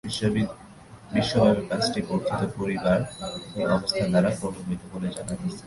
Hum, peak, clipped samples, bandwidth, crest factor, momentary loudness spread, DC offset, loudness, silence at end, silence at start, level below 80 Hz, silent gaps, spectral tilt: none; -8 dBFS; under 0.1%; 11.5 kHz; 18 dB; 11 LU; under 0.1%; -26 LUFS; 0 s; 0.05 s; -50 dBFS; none; -6 dB/octave